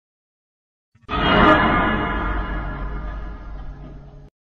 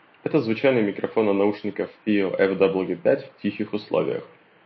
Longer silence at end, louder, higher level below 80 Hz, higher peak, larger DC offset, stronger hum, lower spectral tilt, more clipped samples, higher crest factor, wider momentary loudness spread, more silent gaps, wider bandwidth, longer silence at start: about the same, 0.3 s vs 0.4 s; first, -19 LUFS vs -23 LUFS; first, -30 dBFS vs -64 dBFS; first, -2 dBFS vs -6 dBFS; neither; neither; second, -7.5 dB/octave vs -9 dB/octave; neither; about the same, 20 dB vs 18 dB; first, 24 LU vs 9 LU; neither; first, 7 kHz vs 5.8 kHz; first, 1.1 s vs 0.25 s